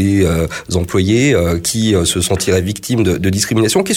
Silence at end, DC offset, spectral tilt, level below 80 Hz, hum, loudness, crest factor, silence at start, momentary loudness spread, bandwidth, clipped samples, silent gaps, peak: 0 s; under 0.1%; -4.5 dB/octave; -32 dBFS; none; -14 LUFS; 12 dB; 0 s; 5 LU; 17 kHz; under 0.1%; none; -2 dBFS